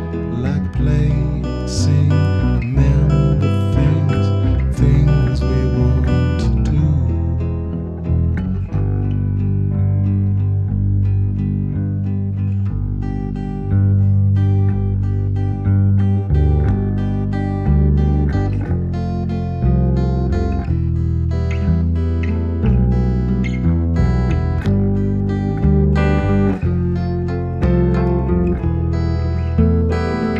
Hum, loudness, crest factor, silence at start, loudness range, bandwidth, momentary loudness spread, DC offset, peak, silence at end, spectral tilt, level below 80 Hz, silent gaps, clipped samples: none; -17 LUFS; 14 dB; 0 s; 3 LU; 8.2 kHz; 6 LU; under 0.1%; -2 dBFS; 0 s; -9 dB/octave; -22 dBFS; none; under 0.1%